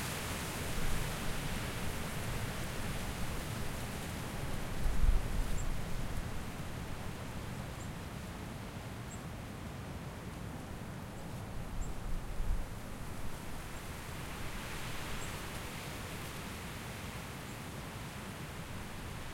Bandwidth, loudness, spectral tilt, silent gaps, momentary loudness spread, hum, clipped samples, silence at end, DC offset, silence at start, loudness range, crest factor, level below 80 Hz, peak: 16.5 kHz; -42 LUFS; -4.5 dB/octave; none; 7 LU; none; under 0.1%; 0 s; under 0.1%; 0 s; 5 LU; 20 dB; -42 dBFS; -18 dBFS